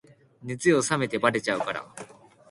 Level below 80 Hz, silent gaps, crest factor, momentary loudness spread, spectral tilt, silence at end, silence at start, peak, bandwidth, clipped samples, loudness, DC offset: -64 dBFS; none; 24 dB; 21 LU; -4.5 dB/octave; 0.45 s; 0.4 s; -4 dBFS; 11.5 kHz; under 0.1%; -25 LUFS; under 0.1%